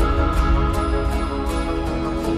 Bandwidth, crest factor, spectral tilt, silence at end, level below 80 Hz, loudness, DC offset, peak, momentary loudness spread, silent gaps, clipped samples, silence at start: 14 kHz; 14 dB; -7 dB/octave; 0 s; -22 dBFS; -22 LUFS; under 0.1%; -6 dBFS; 4 LU; none; under 0.1%; 0 s